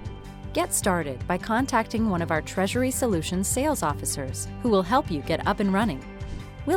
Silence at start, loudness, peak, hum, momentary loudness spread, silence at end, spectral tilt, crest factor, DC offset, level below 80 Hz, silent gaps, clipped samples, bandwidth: 0 s; -25 LUFS; -8 dBFS; none; 10 LU; 0 s; -4.5 dB/octave; 18 dB; under 0.1%; -42 dBFS; none; under 0.1%; 17.5 kHz